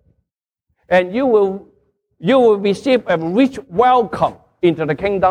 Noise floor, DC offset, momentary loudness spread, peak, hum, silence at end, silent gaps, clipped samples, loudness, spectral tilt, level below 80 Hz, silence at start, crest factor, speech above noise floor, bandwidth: -77 dBFS; under 0.1%; 7 LU; -2 dBFS; none; 0 s; none; under 0.1%; -16 LUFS; -7 dB/octave; -50 dBFS; 0.9 s; 14 dB; 62 dB; 10.5 kHz